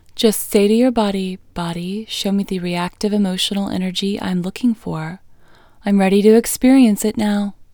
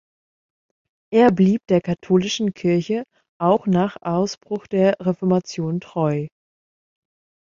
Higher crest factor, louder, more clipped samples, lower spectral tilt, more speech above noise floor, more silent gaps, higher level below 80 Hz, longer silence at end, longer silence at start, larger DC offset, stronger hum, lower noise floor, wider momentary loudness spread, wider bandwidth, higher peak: about the same, 16 dB vs 18 dB; first, -17 LUFS vs -20 LUFS; neither; second, -5 dB/octave vs -7 dB/octave; second, 29 dB vs over 71 dB; second, none vs 3.29-3.40 s; first, -46 dBFS vs -60 dBFS; second, 0.1 s vs 1.3 s; second, 0.15 s vs 1.1 s; neither; neither; second, -45 dBFS vs under -90 dBFS; first, 13 LU vs 9 LU; first, over 20 kHz vs 7.4 kHz; about the same, 0 dBFS vs -2 dBFS